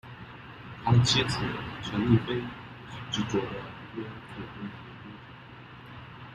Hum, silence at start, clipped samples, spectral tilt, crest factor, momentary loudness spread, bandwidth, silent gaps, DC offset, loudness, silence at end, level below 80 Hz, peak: none; 0.05 s; under 0.1%; -5.5 dB/octave; 22 dB; 21 LU; 11 kHz; none; under 0.1%; -29 LUFS; 0 s; -52 dBFS; -10 dBFS